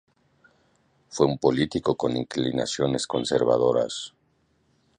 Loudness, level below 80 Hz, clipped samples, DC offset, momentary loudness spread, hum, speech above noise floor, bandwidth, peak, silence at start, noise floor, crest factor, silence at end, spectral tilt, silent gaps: -24 LUFS; -56 dBFS; under 0.1%; under 0.1%; 8 LU; none; 43 dB; 10.5 kHz; -4 dBFS; 1.1 s; -67 dBFS; 22 dB; 0.9 s; -5 dB/octave; none